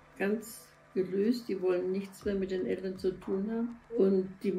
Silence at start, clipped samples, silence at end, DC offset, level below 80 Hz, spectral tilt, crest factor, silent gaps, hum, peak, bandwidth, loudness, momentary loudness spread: 0.15 s; under 0.1%; 0 s; under 0.1%; -62 dBFS; -7 dB/octave; 16 dB; none; none; -16 dBFS; 15 kHz; -33 LUFS; 8 LU